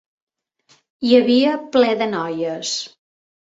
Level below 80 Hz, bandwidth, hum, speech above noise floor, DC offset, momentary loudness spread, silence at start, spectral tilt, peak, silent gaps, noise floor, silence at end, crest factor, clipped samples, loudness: -66 dBFS; 8 kHz; none; 41 dB; under 0.1%; 11 LU; 1 s; -4 dB/octave; -2 dBFS; none; -59 dBFS; 0.65 s; 18 dB; under 0.1%; -18 LUFS